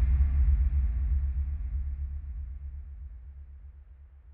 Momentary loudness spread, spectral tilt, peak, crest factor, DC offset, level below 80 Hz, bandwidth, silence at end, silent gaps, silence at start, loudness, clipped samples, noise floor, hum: 22 LU; -10.5 dB/octave; -16 dBFS; 14 dB; under 0.1%; -30 dBFS; 2.6 kHz; 0 s; none; 0 s; -31 LUFS; under 0.1%; -51 dBFS; none